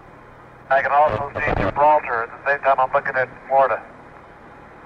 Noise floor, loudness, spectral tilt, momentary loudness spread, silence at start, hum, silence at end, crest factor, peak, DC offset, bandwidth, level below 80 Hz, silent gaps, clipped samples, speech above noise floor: -44 dBFS; -19 LUFS; -7 dB/octave; 7 LU; 0.7 s; none; 0.05 s; 14 dB; -6 dBFS; under 0.1%; 6.8 kHz; -42 dBFS; none; under 0.1%; 25 dB